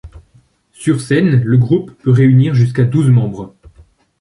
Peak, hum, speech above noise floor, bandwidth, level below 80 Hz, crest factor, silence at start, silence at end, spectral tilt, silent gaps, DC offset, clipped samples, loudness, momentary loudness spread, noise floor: 0 dBFS; none; 40 dB; 11 kHz; -44 dBFS; 12 dB; 0.05 s; 0.75 s; -8 dB/octave; none; under 0.1%; under 0.1%; -13 LUFS; 11 LU; -52 dBFS